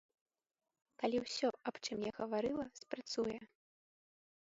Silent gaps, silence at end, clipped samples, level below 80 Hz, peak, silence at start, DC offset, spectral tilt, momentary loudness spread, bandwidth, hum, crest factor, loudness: none; 1.1 s; under 0.1%; -74 dBFS; -22 dBFS; 1 s; under 0.1%; -3 dB/octave; 7 LU; 7.6 kHz; none; 20 dB; -41 LUFS